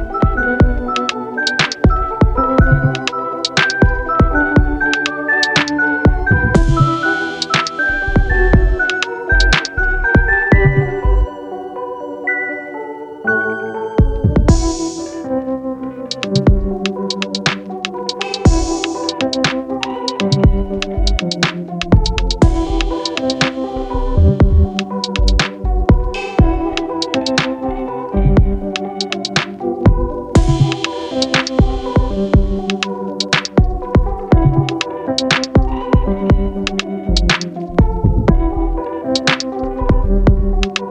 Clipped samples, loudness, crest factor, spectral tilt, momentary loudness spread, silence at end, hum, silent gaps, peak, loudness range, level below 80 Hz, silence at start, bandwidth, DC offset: under 0.1%; -16 LUFS; 14 dB; -5.5 dB/octave; 8 LU; 0 s; none; none; 0 dBFS; 4 LU; -20 dBFS; 0 s; 9.6 kHz; under 0.1%